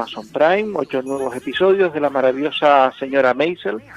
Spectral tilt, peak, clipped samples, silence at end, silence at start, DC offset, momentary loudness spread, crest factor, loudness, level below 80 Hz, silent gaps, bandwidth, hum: -5.5 dB/octave; 0 dBFS; under 0.1%; 0 s; 0 s; under 0.1%; 9 LU; 18 dB; -18 LUFS; -60 dBFS; none; 12 kHz; none